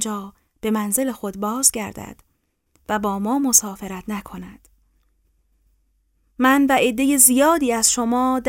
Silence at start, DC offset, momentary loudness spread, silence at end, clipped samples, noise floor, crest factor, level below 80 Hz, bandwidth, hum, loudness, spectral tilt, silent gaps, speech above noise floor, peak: 0 s; under 0.1%; 19 LU; 0 s; under 0.1%; -66 dBFS; 20 dB; -52 dBFS; 16.5 kHz; none; -18 LUFS; -2.5 dB/octave; none; 46 dB; 0 dBFS